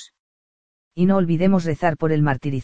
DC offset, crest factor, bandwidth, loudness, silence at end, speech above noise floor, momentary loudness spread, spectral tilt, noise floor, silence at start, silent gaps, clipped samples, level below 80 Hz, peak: under 0.1%; 16 dB; 7.8 kHz; -20 LUFS; 0 s; over 71 dB; 4 LU; -8.5 dB/octave; under -90 dBFS; 0 s; 0.20-0.91 s; under 0.1%; -48 dBFS; -4 dBFS